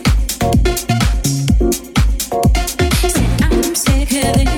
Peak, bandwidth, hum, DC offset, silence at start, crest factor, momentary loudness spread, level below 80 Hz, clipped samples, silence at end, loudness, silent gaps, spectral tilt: 0 dBFS; 18.5 kHz; none; under 0.1%; 0 s; 14 dB; 2 LU; -18 dBFS; under 0.1%; 0 s; -15 LUFS; none; -5 dB/octave